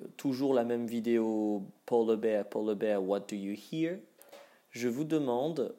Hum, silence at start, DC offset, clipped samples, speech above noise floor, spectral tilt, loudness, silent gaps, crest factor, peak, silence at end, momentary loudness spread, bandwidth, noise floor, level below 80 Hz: none; 0 s; under 0.1%; under 0.1%; 25 dB; -6.5 dB/octave; -32 LUFS; none; 16 dB; -16 dBFS; 0.05 s; 9 LU; 16 kHz; -56 dBFS; -90 dBFS